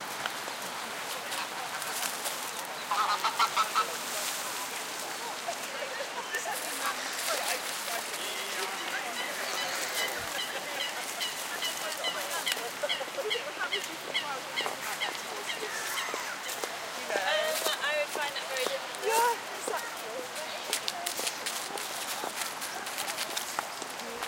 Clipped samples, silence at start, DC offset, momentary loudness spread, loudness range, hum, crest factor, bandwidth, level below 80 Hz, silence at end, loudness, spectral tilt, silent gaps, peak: under 0.1%; 0 s; under 0.1%; 7 LU; 3 LU; none; 26 dB; 17 kHz; -76 dBFS; 0 s; -32 LUFS; 0 dB/octave; none; -8 dBFS